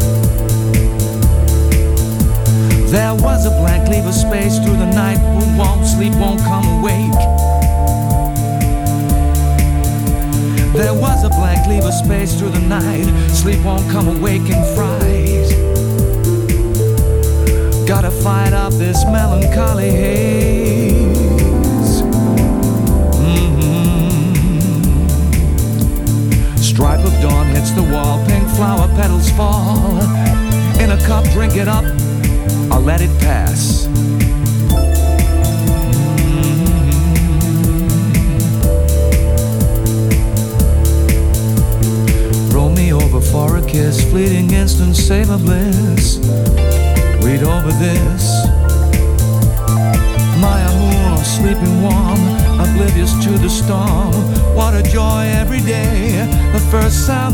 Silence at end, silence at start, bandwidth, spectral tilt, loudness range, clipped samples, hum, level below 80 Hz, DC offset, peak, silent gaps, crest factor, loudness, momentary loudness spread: 0 s; 0 s; 19 kHz; -6 dB/octave; 1 LU; under 0.1%; none; -16 dBFS; under 0.1%; -2 dBFS; none; 10 dB; -13 LUFS; 2 LU